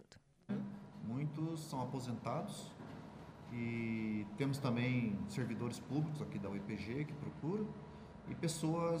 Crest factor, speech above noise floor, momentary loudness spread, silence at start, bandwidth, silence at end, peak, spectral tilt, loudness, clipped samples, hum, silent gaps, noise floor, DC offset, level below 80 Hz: 18 dB; 22 dB; 14 LU; 0 s; 15.5 kHz; 0 s; -24 dBFS; -6.5 dB/octave; -42 LUFS; under 0.1%; none; none; -62 dBFS; under 0.1%; -68 dBFS